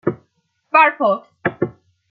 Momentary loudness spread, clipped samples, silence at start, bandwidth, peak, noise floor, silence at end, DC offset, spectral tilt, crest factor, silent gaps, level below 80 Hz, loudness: 13 LU; under 0.1%; 0.05 s; 5 kHz; 0 dBFS; -66 dBFS; 0.4 s; under 0.1%; -8.5 dB/octave; 20 dB; none; -62 dBFS; -18 LUFS